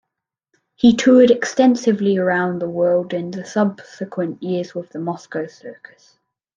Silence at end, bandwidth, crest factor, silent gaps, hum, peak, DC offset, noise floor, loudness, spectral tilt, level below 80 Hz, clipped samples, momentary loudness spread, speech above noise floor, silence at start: 0.85 s; 7.6 kHz; 16 dB; none; none; -2 dBFS; under 0.1%; -81 dBFS; -18 LUFS; -6 dB/octave; -60 dBFS; under 0.1%; 16 LU; 64 dB; 0.85 s